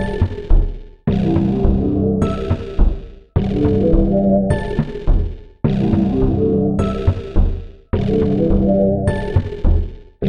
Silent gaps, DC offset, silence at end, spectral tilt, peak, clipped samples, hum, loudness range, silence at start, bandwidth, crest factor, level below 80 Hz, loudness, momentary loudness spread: none; under 0.1%; 0 s; -9.5 dB/octave; -2 dBFS; under 0.1%; none; 1 LU; 0 s; 9.4 kHz; 14 dB; -20 dBFS; -18 LUFS; 7 LU